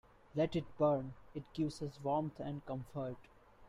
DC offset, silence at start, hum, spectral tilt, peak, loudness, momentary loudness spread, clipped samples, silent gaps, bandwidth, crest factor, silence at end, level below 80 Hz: under 0.1%; 0.35 s; none; -7.5 dB/octave; -20 dBFS; -39 LUFS; 13 LU; under 0.1%; none; 12 kHz; 18 dB; 0 s; -64 dBFS